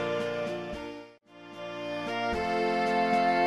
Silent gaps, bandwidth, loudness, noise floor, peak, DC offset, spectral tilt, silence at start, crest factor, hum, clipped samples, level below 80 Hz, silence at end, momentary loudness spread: none; 12.5 kHz; -30 LUFS; -50 dBFS; -14 dBFS; under 0.1%; -5.5 dB/octave; 0 s; 14 dB; none; under 0.1%; -56 dBFS; 0 s; 17 LU